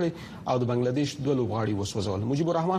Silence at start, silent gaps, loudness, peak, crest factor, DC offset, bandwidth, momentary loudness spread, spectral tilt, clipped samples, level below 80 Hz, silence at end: 0 s; none; -28 LUFS; -14 dBFS; 14 dB; under 0.1%; 13.5 kHz; 4 LU; -6.5 dB/octave; under 0.1%; -56 dBFS; 0 s